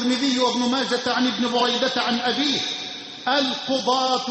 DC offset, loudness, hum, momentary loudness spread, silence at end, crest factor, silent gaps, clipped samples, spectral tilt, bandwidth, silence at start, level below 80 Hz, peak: under 0.1%; -21 LUFS; none; 4 LU; 0 s; 14 dB; none; under 0.1%; -2.5 dB/octave; 8.6 kHz; 0 s; -66 dBFS; -8 dBFS